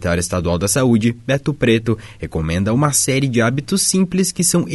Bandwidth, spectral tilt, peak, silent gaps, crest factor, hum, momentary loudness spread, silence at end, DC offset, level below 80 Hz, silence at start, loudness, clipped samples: 12 kHz; -4.5 dB/octave; -2 dBFS; none; 14 dB; none; 6 LU; 0 s; under 0.1%; -38 dBFS; 0 s; -17 LUFS; under 0.1%